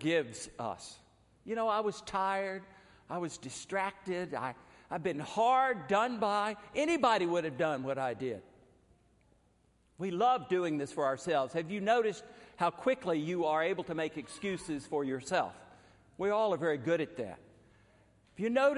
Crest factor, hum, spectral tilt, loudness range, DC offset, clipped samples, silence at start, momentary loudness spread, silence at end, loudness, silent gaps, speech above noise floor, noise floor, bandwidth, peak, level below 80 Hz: 20 dB; none; -5 dB/octave; 5 LU; under 0.1%; under 0.1%; 0 s; 12 LU; 0 s; -33 LUFS; none; 37 dB; -69 dBFS; 11.5 kHz; -14 dBFS; -70 dBFS